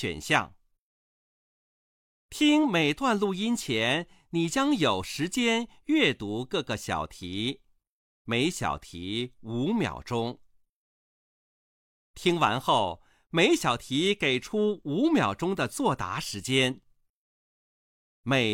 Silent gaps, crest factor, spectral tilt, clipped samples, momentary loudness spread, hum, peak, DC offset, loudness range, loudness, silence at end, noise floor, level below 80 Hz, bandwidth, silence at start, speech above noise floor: 0.79-2.29 s, 7.89-8.25 s, 10.69-12.14 s, 17.10-18.24 s; 22 dB; -4.5 dB/octave; under 0.1%; 10 LU; none; -6 dBFS; under 0.1%; 6 LU; -27 LUFS; 0 s; under -90 dBFS; -58 dBFS; 16.5 kHz; 0 s; over 63 dB